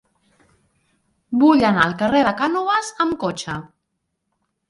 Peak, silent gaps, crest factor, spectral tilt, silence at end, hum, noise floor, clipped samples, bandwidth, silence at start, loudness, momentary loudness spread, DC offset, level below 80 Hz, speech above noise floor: -2 dBFS; none; 20 dB; -5 dB/octave; 1.1 s; none; -75 dBFS; under 0.1%; 11.5 kHz; 1.3 s; -18 LUFS; 12 LU; under 0.1%; -54 dBFS; 57 dB